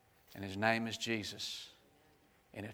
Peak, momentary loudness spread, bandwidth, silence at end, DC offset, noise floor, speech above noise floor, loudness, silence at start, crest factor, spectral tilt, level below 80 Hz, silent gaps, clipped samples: -14 dBFS; 20 LU; over 20 kHz; 0 s; under 0.1%; -69 dBFS; 31 dB; -38 LUFS; 0.3 s; 26 dB; -4 dB/octave; -76 dBFS; none; under 0.1%